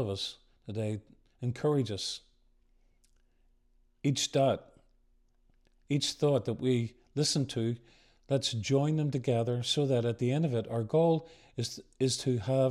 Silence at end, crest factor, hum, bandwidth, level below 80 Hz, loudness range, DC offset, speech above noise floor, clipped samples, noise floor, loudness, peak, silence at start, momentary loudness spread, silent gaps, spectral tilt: 0 s; 16 dB; none; 13.5 kHz; -66 dBFS; 6 LU; under 0.1%; 38 dB; under 0.1%; -68 dBFS; -31 LUFS; -16 dBFS; 0 s; 10 LU; none; -5.5 dB/octave